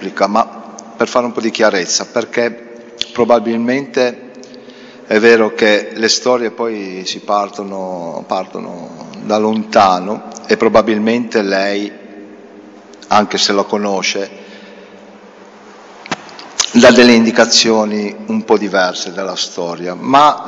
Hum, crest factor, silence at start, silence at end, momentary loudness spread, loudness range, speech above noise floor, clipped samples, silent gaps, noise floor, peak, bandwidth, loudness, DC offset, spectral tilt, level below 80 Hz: none; 14 dB; 0 s; 0 s; 16 LU; 7 LU; 25 dB; 0.2%; none; -38 dBFS; 0 dBFS; 9 kHz; -13 LUFS; under 0.1%; -3 dB/octave; -54 dBFS